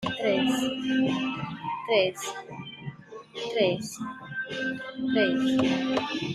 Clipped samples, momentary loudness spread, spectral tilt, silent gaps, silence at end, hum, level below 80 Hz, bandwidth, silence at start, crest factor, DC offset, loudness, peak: under 0.1%; 15 LU; -4.5 dB/octave; none; 0 s; none; -66 dBFS; 13.5 kHz; 0 s; 18 dB; under 0.1%; -27 LUFS; -10 dBFS